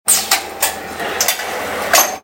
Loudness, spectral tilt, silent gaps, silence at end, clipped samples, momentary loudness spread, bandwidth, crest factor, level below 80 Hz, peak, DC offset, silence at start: -16 LUFS; 0.5 dB/octave; none; 0.05 s; under 0.1%; 9 LU; over 20 kHz; 18 dB; -54 dBFS; 0 dBFS; under 0.1%; 0.05 s